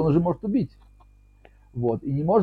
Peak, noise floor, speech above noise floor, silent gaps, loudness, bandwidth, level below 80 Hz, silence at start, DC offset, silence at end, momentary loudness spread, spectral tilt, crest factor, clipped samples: -8 dBFS; -54 dBFS; 31 dB; none; -25 LUFS; 4.8 kHz; -50 dBFS; 0 s; under 0.1%; 0 s; 10 LU; -11.5 dB/octave; 16 dB; under 0.1%